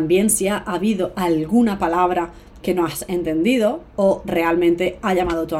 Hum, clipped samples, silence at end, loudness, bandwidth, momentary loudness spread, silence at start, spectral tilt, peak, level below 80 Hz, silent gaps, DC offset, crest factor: none; under 0.1%; 0 s; -19 LUFS; 16.5 kHz; 5 LU; 0 s; -5 dB/octave; -6 dBFS; -44 dBFS; none; under 0.1%; 14 dB